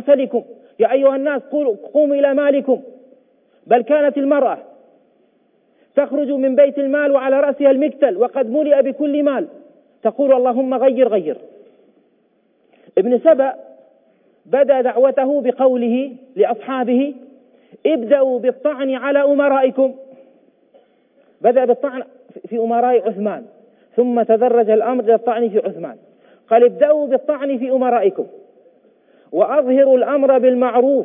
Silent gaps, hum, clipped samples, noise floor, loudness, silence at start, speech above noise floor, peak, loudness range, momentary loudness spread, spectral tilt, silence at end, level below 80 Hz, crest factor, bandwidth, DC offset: none; none; under 0.1%; -60 dBFS; -16 LUFS; 0 s; 44 dB; -2 dBFS; 4 LU; 10 LU; -10 dB/octave; 0 s; -88 dBFS; 16 dB; 3.7 kHz; under 0.1%